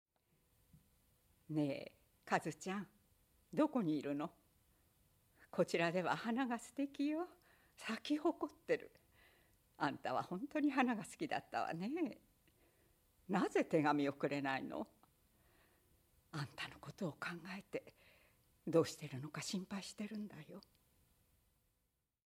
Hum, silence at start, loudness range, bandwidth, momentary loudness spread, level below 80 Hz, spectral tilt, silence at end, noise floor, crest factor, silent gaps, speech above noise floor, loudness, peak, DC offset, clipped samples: none; 0.75 s; 6 LU; over 20 kHz; 13 LU; -80 dBFS; -5.5 dB/octave; 1.7 s; -86 dBFS; 24 dB; none; 45 dB; -41 LUFS; -18 dBFS; under 0.1%; under 0.1%